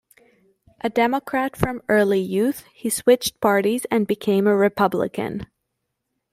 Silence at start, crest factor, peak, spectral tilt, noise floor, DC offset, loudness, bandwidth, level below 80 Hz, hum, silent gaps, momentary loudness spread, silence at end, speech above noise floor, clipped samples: 0.85 s; 18 dB; -2 dBFS; -5 dB/octave; -78 dBFS; under 0.1%; -21 LUFS; 16 kHz; -52 dBFS; none; none; 8 LU; 0.9 s; 57 dB; under 0.1%